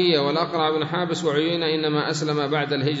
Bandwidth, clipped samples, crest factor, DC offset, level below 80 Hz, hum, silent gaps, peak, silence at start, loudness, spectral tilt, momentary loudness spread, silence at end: 8 kHz; under 0.1%; 16 dB; under 0.1%; -66 dBFS; none; none; -6 dBFS; 0 s; -22 LUFS; -5 dB/octave; 3 LU; 0 s